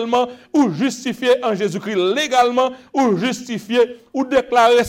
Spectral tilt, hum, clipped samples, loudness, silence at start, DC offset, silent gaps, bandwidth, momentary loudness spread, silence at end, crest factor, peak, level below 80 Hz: -4.5 dB/octave; none; under 0.1%; -18 LUFS; 0 s; under 0.1%; none; 16 kHz; 6 LU; 0 s; 16 dB; -2 dBFS; -56 dBFS